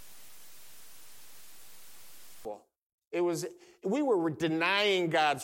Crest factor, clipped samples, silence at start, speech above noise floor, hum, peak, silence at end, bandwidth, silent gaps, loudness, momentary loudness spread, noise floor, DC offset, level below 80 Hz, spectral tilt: 20 dB; under 0.1%; 0 s; 26 dB; none; -14 dBFS; 0 s; 17 kHz; 2.83-2.98 s, 3.07-3.11 s; -30 LUFS; 25 LU; -55 dBFS; under 0.1%; -72 dBFS; -4 dB/octave